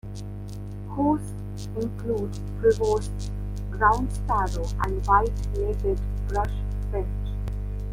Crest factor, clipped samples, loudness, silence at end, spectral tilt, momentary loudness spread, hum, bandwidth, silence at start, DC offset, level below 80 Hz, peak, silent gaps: 20 dB; under 0.1%; -27 LUFS; 0 s; -7 dB/octave; 13 LU; 50 Hz at -30 dBFS; 12 kHz; 0.05 s; under 0.1%; -30 dBFS; -6 dBFS; none